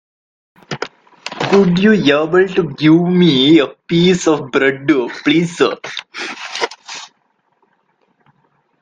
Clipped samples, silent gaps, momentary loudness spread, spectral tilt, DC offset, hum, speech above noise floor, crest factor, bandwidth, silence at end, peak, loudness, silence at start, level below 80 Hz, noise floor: under 0.1%; none; 17 LU; -5.5 dB/octave; under 0.1%; none; 50 dB; 16 dB; 9.4 kHz; 1.75 s; 0 dBFS; -13 LUFS; 0.7 s; -54 dBFS; -63 dBFS